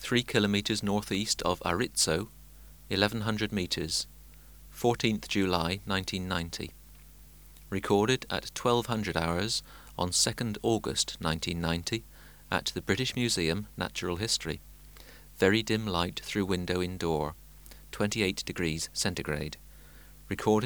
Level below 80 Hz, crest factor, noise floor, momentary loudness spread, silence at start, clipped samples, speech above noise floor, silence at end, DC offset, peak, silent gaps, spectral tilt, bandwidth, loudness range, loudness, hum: -50 dBFS; 26 dB; -52 dBFS; 11 LU; 0 s; under 0.1%; 22 dB; 0 s; under 0.1%; -6 dBFS; none; -4 dB/octave; over 20 kHz; 3 LU; -30 LUFS; none